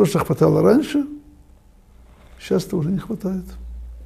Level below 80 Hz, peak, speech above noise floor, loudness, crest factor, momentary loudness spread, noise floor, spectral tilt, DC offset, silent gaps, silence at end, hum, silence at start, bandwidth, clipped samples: -42 dBFS; -4 dBFS; 31 dB; -20 LUFS; 18 dB; 22 LU; -49 dBFS; -7 dB/octave; under 0.1%; none; 0 s; none; 0 s; 15.5 kHz; under 0.1%